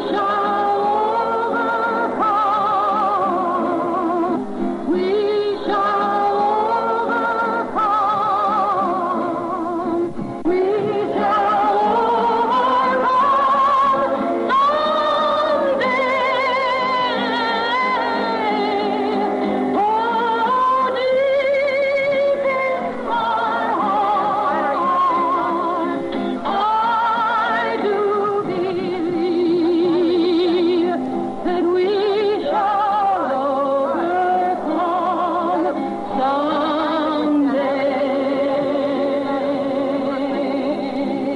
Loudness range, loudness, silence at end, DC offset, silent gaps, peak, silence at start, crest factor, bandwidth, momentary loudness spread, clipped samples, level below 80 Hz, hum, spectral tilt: 3 LU; -19 LUFS; 0 s; under 0.1%; none; -8 dBFS; 0 s; 10 dB; 11 kHz; 5 LU; under 0.1%; -56 dBFS; none; -6 dB/octave